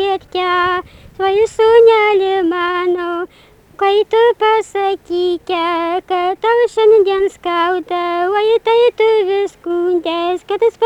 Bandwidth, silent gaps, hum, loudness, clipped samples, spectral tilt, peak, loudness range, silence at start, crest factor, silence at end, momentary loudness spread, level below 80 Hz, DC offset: 10.5 kHz; none; none; -14 LUFS; under 0.1%; -4 dB/octave; 0 dBFS; 3 LU; 0 s; 14 dB; 0 s; 8 LU; -52 dBFS; under 0.1%